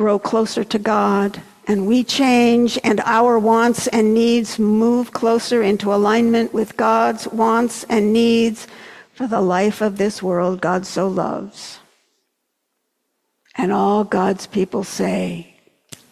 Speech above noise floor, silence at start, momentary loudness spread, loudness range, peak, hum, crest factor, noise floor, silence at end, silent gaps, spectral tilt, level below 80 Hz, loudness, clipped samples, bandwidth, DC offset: 57 dB; 0 s; 9 LU; 8 LU; -4 dBFS; none; 14 dB; -73 dBFS; 0.7 s; none; -5 dB/octave; -58 dBFS; -17 LUFS; under 0.1%; 14 kHz; under 0.1%